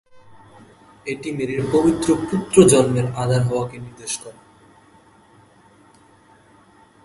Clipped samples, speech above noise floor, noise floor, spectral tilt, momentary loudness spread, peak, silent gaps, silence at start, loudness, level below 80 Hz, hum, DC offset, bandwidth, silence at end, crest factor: under 0.1%; 33 dB; -52 dBFS; -5.5 dB/octave; 17 LU; 0 dBFS; none; 0.15 s; -19 LUFS; -50 dBFS; none; under 0.1%; 12 kHz; 2.75 s; 22 dB